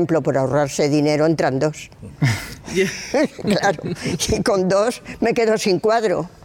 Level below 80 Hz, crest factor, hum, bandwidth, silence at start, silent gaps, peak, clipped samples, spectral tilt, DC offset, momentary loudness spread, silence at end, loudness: -44 dBFS; 12 dB; none; 17 kHz; 0 s; none; -6 dBFS; under 0.1%; -5 dB/octave; under 0.1%; 7 LU; 0 s; -19 LUFS